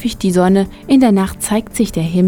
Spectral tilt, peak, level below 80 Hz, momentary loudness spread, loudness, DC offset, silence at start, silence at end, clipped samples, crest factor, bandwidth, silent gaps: -6 dB/octave; 0 dBFS; -36 dBFS; 7 LU; -14 LUFS; under 0.1%; 0 s; 0 s; under 0.1%; 14 dB; 18 kHz; none